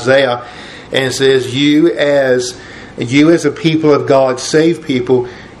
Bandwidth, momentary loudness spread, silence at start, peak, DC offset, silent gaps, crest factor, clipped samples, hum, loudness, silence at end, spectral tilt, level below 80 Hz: 12.5 kHz; 13 LU; 0 s; 0 dBFS; under 0.1%; none; 12 dB; under 0.1%; none; -12 LUFS; 0.15 s; -5 dB/octave; -48 dBFS